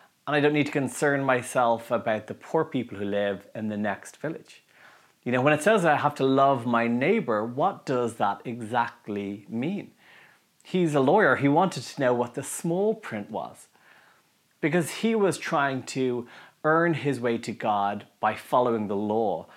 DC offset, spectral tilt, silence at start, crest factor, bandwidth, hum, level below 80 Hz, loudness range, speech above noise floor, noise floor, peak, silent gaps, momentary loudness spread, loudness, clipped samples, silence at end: under 0.1%; -5.5 dB/octave; 0.25 s; 20 dB; 16 kHz; none; -80 dBFS; 6 LU; 39 dB; -65 dBFS; -6 dBFS; none; 12 LU; -26 LUFS; under 0.1%; 0.1 s